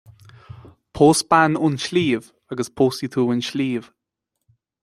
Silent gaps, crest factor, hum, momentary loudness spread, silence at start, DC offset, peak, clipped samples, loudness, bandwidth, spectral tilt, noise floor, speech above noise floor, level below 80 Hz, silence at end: none; 20 dB; none; 13 LU; 0.55 s; under 0.1%; -2 dBFS; under 0.1%; -20 LUFS; 14 kHz; -5 dB/octave; -80 dBFS; 61 dB; -54 dBFS; 1 s